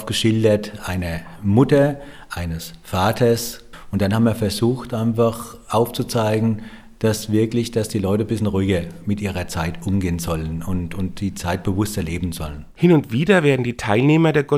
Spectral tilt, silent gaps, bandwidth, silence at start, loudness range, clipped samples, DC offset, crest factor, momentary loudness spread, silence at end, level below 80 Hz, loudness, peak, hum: -6 dB/octave; none; 16.5 kHz; 0 s; 4 LU; under 0.1%; under 0.1%; 20 dB; 12 LU; 0 s; -42 dBFS; -20 LUFS; 0 dBFS; none